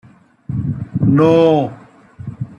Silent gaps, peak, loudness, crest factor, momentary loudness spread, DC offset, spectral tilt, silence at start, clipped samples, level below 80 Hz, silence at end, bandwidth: none; -2 dBFS; -15 LUFS; 14 dB; 19 LU; under 0.1%; -9 dB/octave; 0.5 s; under 0.1%; -46 dBFS; 0.05 s; 7 kHz